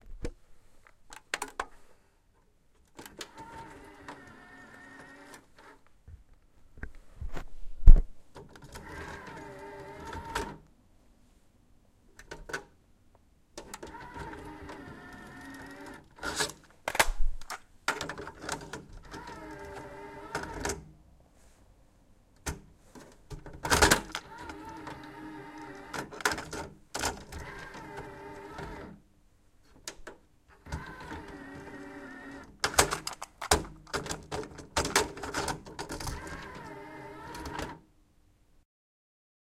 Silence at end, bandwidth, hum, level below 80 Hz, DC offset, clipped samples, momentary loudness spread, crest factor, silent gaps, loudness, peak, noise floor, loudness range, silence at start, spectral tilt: 1.8 s; 16 kHz; none; -34 dBFS; under 0.1%; under 0.1%; 22 LU; 30 dB; none; -35 LUFS; -2 dBFS; -65 dBFS; 17 LU; 0.05 s; -3 dB/octave